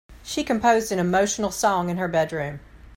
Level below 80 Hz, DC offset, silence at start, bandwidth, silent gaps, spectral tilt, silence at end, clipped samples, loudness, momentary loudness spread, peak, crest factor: -48 dBFS; under 0.1%; 0.1 s; 16.5 kHz; none; -4.5 dB/octave; 0.05 s; under 0.1%; -23 LUFS; 11 LU; -6 dBFS; 16 dB